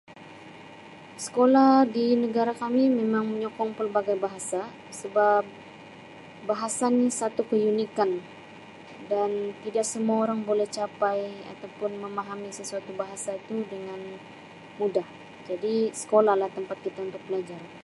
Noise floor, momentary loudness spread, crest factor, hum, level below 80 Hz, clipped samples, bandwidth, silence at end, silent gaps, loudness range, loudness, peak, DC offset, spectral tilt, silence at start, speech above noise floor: -46 dBFS; 23 LU; 20 dB; none; -74 dBFS; under 0.1%; 11.5 kHz; 0.05 s; none; 10 LU; -26 LUFS; -8 dBFS; under 0.1%; -4.5 dB/octave; 0.1 s; 20 dB